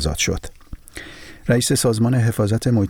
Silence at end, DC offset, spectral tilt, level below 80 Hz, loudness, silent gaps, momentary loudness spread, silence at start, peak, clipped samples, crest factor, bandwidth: 0 s; under 0.1%; -5 dB/octave; -36 dBFS; -19 LUFS; none; 20 LU; 0 s; -6 dBFS; under 0.1%; 14 dB; 18 kHz